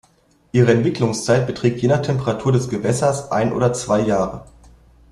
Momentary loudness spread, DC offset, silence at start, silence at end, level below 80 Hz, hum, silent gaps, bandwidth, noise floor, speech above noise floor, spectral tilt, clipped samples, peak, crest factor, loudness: 5 LU; under 0.1%; 0.55 s; 0.7 s; -48 dBFS; none; none; 12 kHz; -57 dBFS; 39 dB; -6 dB/octave; under 0.1%; -2 dBFS; 16 dB; -19 LUFS